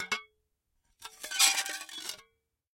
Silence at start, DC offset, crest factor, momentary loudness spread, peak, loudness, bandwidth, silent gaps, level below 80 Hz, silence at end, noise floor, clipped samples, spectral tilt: 0 s; under 0.1%; 26 dB; 25 LU; -10 dBFS; -29 LUFS; 17 kHz; none; -76 dBFS; 0.6 s; -78 dBFS; under 0.1%; 3 dB/octave